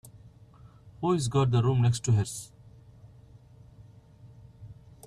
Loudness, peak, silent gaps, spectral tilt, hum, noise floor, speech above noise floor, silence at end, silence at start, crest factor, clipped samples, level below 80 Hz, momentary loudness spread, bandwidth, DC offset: -27 LUFS; -12 dBFS; none; -6.5 dB/octave; none; -53 dBFS; 28 dB; 0.35 s; 0.25 s; 18 dB; under 0.1%; -56 dBFS; 25 LU; 13 kHz; under 0.1%